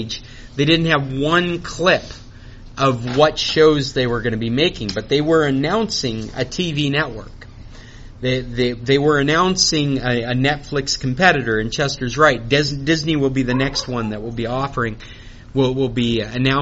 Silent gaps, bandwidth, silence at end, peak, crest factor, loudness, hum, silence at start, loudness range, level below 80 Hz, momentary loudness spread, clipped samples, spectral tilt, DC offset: none; 8 kHz; 0 s; 0 dBFS; 18 dB; -18 LUFS; none; 0 s; 4 LU; -38 dBFS; 10 LU; under 0.1%; -4 dB/octave; under 0.1%